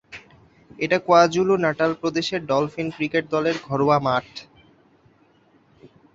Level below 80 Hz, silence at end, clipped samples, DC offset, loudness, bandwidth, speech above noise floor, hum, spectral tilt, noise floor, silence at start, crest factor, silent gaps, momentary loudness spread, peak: -60 dBFS; 0.3 s; under 0.1%; under 0.1%; -21 LUFS; 7.8 kHz; 37 dB; none; -5.5 dB/octave; -58 dBFS; 0.1 s; 20 dB; none; 13 LU; -2 dBFS